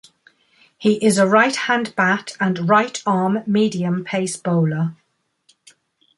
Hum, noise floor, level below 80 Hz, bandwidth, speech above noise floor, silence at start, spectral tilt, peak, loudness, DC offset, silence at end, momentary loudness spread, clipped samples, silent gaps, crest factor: none; -62 dBFS; -64 dBFS; 11.5 kHz; 44 dB; 0.8 s; -5.5 dB/octave; 0 dBFS; -18 LUFS; under 0.1%; 1.25 s; 8 LU; under 0.1%; none; 20 dB